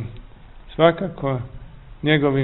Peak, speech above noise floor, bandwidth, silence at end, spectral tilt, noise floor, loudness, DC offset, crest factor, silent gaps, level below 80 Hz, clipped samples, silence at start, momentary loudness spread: -2 dBFS; 23 dB; 4.2 kHz; 0 s; -11 dB/octave; -41 dBFS; -21 LUFS; 0.1%; 20 dB; none; -42 dBFS; under 0.1%; 0 s; 18 LU